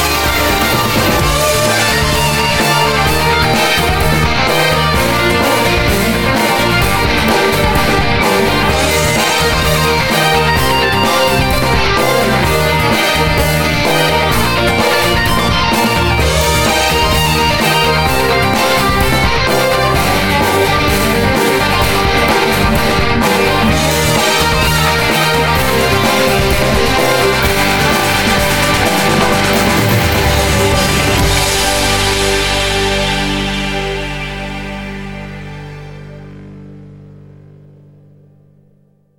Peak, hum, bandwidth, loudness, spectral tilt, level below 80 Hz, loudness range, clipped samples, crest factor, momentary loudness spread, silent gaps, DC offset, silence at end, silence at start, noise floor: 0 dBFS; 50 Hz at -40 dBFS; 17.5 kHz; -11 LUFS; -4 dB/octave; -24 dBFS; 3 LU; under 0.1%; 12 dB; 2 LU; none; under 0.1%; 2.05 s; 0 s; -51 dBFS